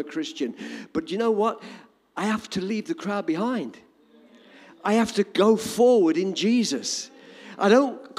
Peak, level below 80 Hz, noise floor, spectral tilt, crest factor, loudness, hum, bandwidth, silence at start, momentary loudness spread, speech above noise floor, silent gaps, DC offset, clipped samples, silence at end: -6 dBFS; -66 dBFS; -55 dBFS; -4.5 dB/octave; 18 dB; -24 LUFS; none; 15.5 kHz; 0 s; 14 LU; 32 dB; none; under 0.1%; under 0.1%; 0.1 s